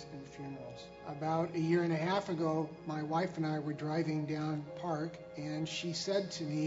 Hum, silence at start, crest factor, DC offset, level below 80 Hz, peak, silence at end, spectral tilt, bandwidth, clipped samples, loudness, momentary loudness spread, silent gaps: none; 0 s; 18 dB; under 0.1%; -70 dBFS; -18 dBFS; 0 s; -5.5 dB/octave; 7.6 kHz; under 0.1%; -36 LUFS; 14 LU; none